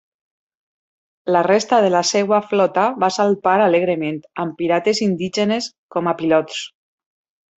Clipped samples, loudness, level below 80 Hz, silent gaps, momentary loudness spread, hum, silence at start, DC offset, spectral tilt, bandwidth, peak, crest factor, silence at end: under 0.1%; -18 LUFS; -64 dBFS; 5.78-5.89 s; 11 LU; none; 1.25 s; under 0.1%; -4.5 dB/octave; 8.4 kHz; -2 dBFS; 16 dB; 0.9 s